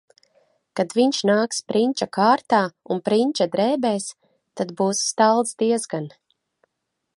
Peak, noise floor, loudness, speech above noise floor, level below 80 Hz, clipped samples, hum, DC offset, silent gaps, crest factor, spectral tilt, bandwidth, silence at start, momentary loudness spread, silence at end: -4 dBFS; -79 dBFS; -21 LUFS; 58 dB; -72 dBFS; under 0.1%; none; under 0.1%; none; 18 dB; -4 dB/octave; 11.5 kHz; 0.75 s; 12 LU; 1.1 s